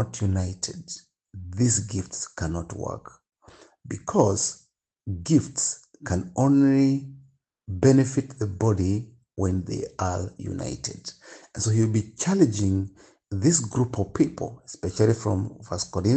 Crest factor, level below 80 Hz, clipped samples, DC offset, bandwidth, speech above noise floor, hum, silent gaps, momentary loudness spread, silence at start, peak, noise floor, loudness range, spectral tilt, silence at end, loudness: 20 dB; -54 dBFS; under 0.1%; under 0.1%; 9.2 kHz; 33 dB; none; none; 16 LU; 0 s; -4 dBFS; -57 dBFS; 6 LU; -6 dB/octave; 0 s; -25 LUFS